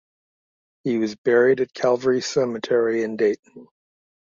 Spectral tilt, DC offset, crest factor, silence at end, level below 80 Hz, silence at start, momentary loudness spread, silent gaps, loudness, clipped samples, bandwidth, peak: -5 dB/octave; under 0.1%; 16 dB; 0.6 s; -68 dBFS; 0.85 s; 7 LU; 1.18-1.24 s, 3.39-3.43 s; -21 LUFS; under 0.1%; 7.6 kHz; -6 dBFS